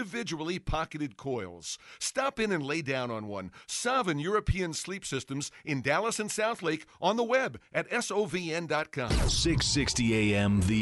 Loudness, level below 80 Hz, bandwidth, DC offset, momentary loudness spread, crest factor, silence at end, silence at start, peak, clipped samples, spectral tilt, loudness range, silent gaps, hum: -30 LUFS; -42 dBFS; 11.5 kHz; under 0.1%; 10 LU; 18 dB; 0 s; 0 s; -12 dBFS; under 0.1%; -4 dB/octave; 4 LU; none; none